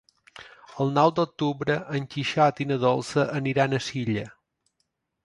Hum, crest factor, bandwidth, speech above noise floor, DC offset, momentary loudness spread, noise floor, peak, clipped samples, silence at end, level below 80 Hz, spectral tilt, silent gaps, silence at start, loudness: none; 20 dB; 11.5 kHz; 52 dB; under 0.1%; 10 LU; -77 dBFS; -6 dBFS; under 0.1%; 0.95 s; -62 dBFS; -6 dB/octave; none; 0.35 s; -25 LUFS